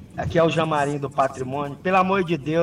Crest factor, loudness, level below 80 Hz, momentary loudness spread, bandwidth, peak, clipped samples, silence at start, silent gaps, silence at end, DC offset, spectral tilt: 14 dB; -22 LUFS; -50 dBFS; 7 LU; 12.5 kHz; -8 dBFS; under 0.1%; 0 s; none; 0 s; under 0.1%; -6.5 dB/octave